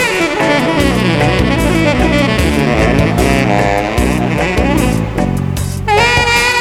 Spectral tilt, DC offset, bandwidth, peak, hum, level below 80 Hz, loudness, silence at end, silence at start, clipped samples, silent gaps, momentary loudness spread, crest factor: -5 dB/octave; under 0.1%; 17 kHz; 0 dBFS; none; -22 dBFS; -12 LUFS; 0 s; 0 s; under 0.1%; none; 6 LU; 12 dB